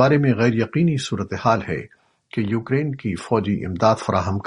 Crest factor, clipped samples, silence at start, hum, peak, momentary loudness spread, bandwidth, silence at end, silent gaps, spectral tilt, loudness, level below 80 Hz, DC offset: 18 dB; under 0.1%; 0 s; none; -2 dBFS; 9 LU; 11 kHz; 0.05 s; none; -7 dB/octave; -21 LUFS; -52 dBFS; under 0.1%